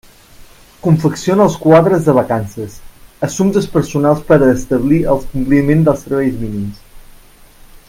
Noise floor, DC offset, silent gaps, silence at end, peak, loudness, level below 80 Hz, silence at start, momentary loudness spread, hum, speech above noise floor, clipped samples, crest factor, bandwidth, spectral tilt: -41 dBFS; under 0.1%; none; 0.9 s; 0 dBFS; -13 LUFS; -34 dBFS; 0.85 s; 13 LU; none; 29 dB; under 0.1%; 14 dB; 16 kHz; -7.5 dB/octave